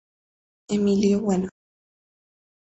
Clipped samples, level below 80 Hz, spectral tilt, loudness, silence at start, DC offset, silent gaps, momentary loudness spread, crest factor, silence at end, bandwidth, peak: under 0.1%; -56 dBFS; -7 dB/octave; -23 LUFS; 0.7 s; under 0.1%; none; 8 LU; 18 dB; 1.25 s; 8.2 kHz; -8 dBFS